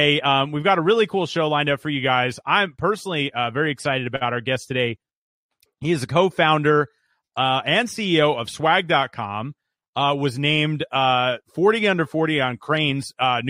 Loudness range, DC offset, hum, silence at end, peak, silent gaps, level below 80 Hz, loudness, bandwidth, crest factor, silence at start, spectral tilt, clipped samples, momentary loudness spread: 3 LU; under 0.1%; none; 0 s; -4 dBFS; 5.15-5.49 s, 9.88-9.93 s; -60 dBFS; -21 LUFS; 15 kHz; 18 dB; 0 s; -5 dB/octave; under 0.1%; 7 LU